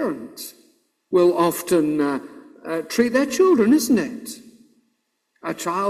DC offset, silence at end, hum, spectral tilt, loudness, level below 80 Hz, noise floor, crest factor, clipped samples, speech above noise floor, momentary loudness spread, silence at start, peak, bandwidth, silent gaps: under 0.1%; 0 s; none; -5 dB/octave; -20 LUFS; -62 dBFS; -71 dBFS; 16 dB; under 0.1%; 52 dB; 19 LU; 0 s; -4 dBFS; 16 kHz; none